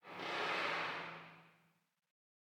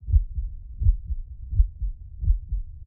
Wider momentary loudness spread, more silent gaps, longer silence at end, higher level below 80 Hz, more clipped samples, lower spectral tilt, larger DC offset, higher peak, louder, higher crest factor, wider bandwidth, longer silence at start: first, 16 LU vs 11 LU; neither; first, 0.95 s vs 0.05 s; second, under -90 dBFS vs -24 dBFS; neither; second, -3 dB/octave vs -17 dB/octave; neither; second, -26 dBFS vs -6 dBFS; second, -40 LUFS vs -29 LUFS; about the same, 18 dB vs 18 dB; first, 19 kHz vs 0.4 kHz; about the same, 0.05 s vs 0 s